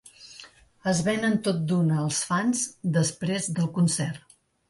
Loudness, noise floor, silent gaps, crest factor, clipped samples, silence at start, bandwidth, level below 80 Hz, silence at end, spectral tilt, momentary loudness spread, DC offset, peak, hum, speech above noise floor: -26 LUFS; -50 dBFS; none; 14 dB; under 0.1%; 0.05 s; 11.5 kHz; -62 dBFS; 0.5 s; -5 dB/octave; 18 LU; under 0.1%; -12 dBFS; none; 25 dB